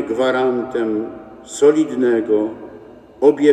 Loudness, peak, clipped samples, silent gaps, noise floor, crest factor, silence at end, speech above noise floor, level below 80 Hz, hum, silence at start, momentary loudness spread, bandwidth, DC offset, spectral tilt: -17 LUFS; 0 dBFS; under 0.1%; none; -40 dBFS; 16 dB; 0 s; 24 dB; -58 dBFS; none; 0 s; 18 LU; 9.8 kHz; under 0.1%; -5.5 dB/octave